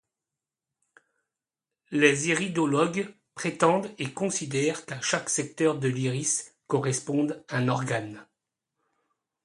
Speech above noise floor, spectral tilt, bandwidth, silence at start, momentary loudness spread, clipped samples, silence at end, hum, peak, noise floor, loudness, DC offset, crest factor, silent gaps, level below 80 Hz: 63 dB; -4 dB/octave; 11.5 kHz; 1.9 s; 9 LU; under 0.1%; 1.2 s; none; -6 dBFS; -89 dBFS; -27 LUFS; under 0.1%; 24 dB; none; -70 dBFS